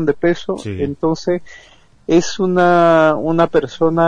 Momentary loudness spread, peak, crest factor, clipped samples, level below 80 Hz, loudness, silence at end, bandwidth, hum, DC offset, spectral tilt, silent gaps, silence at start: 11 LU; -2 dBFS; 12 dB; under 0.1%; -46 dBFS; -15 LUFS; 0 s; 9.6 kHz; none; under 0.1%; -6 dB/octave; none; 0 s